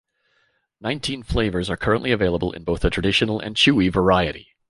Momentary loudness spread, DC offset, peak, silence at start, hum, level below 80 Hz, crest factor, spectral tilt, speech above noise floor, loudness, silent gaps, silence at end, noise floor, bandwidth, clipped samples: 9 LU; under 0.1%; -4 dBFS; 0.8 s; none; -36 dBFS; 18 dB; -5.5 dB/octave; 46 dB; -21 LUFS; none; 0.3 s; -66 dBFS; 11.5 kHz; under 0.1%